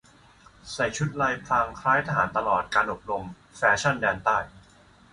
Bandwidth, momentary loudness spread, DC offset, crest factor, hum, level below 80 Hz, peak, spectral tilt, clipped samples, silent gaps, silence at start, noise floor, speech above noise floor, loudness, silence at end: 11.5 kHz; 10 LU; under 0.1%; 20 dB; none; -54 dBFS; -8 dBFS; -4.5 dB/octave; under 0.1%; none; 0.65 s; -55 dBFS; 30 dB; -25 LUFS; 0.55 s